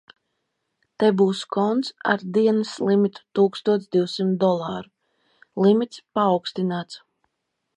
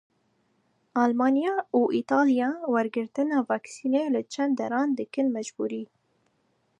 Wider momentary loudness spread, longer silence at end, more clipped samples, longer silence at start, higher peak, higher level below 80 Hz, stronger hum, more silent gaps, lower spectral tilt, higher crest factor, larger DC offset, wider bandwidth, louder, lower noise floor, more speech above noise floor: about the same, 9 LU vs 9 LU; second, 0.8 s vs 0.95 s; neither; about the same, 1 s vs 0.95 s; first, -6 dBFS vs -10 dBFS; first, -72 dBFS vs -82 dBFS; neither; neither; first, -6.5 dB/octave vs -5 dB/octave; about the same, 18 dB vs 18 dB; neither; about the same, 10 kHz vs 10 kHz; first, -22 LUFS vs -26 LUFS; first, -78 dBFS vs -71 dBFS; first, 56 dB vs 45 dB